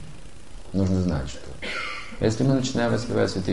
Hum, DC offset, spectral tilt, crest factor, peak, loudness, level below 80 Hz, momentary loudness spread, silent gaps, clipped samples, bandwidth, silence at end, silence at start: none; 2%; -6 dB/octave; 16 dB; -8 dBFS; -25 LUFS; -40 dBFS; 11 LU; none; under 0.1%; 11.5 kHz; 0 s; 0 s